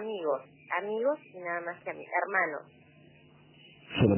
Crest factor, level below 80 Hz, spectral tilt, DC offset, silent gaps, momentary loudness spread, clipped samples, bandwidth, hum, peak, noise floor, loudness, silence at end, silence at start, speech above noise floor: 22 dB; -58 dBFS; -5 dB/octave; under 0.1%; none; 10 LU; under 0.1%; 3.2 kHz; none; -10 dBFS; -58 dBFS; -33 LUFS; 0 s; 0 s; 27 dB